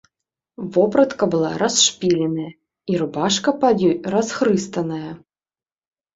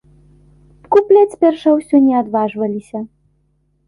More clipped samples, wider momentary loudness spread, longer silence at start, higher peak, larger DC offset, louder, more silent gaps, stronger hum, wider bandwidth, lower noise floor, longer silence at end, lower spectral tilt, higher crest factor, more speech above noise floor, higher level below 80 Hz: neither; second, 13 LU vs 16 LU; second, 0.6 s vs 0.9 s; about the same, -2 dBFS vs -2 dBFS; neither; second, -19 LUFS vs -14 LUFS; neither; neither; second, 8 kHz vs 11 kHz; first, under -90 dBFS vs -61 dBFS; first, 0.95 s vs 0.8 s; second, -4 dB/octave vs -7.5 dB/octave; about the same, 18 dB vs 14 dB; first, over 71 dB vs 48 dB; about the same, -60 dBFS vs -56 dBFS